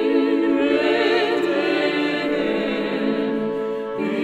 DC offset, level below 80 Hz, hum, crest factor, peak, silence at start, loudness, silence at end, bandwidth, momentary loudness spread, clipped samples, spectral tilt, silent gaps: under 0.1%; -56 dBFS; none; 14 dB; -6 dBFS; 0 s; -21 LUFS; 0 s; 11.5 kHz; 6 LU; under 0.1%; -5.5 dB/octave; none